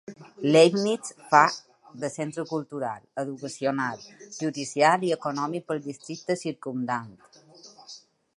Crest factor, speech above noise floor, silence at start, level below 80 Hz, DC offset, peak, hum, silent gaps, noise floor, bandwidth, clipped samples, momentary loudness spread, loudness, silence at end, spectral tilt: 24 dB; 24 dB; 0.1 s; -76 dBFS; under 0.1%; -2 dBFS; none; none; -50 dBFS; 11.5 kHz; under 0.1%; 21 LU; -26 LUFS; 0.4 s; -4.5 dB/octave